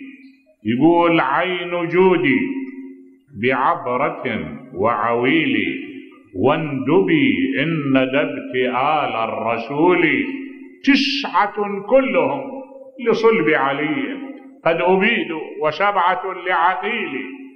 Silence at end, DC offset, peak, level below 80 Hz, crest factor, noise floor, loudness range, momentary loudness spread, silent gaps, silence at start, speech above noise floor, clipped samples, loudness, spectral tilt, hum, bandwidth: 0.05 s; under 0.1%; -2 dBFS; -58 dBFS; 16 dB; -47 dBFS; 2 LU; 13 LU; none; 0 s; 29 dB; under 0.1%; -18 LUFS; -6.5 dB/octave; none; 6.6 kHz